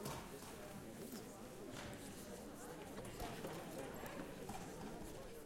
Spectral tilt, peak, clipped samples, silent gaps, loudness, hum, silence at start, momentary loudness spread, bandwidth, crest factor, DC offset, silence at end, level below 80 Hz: -4.5 dB/octave; -32 dBFS; under 0.1%; none; -51 LUFS; none; 0 s; 4 LU; 16.5 kHz; 18 dB; under 0.1%; 0 s; -64 dBFS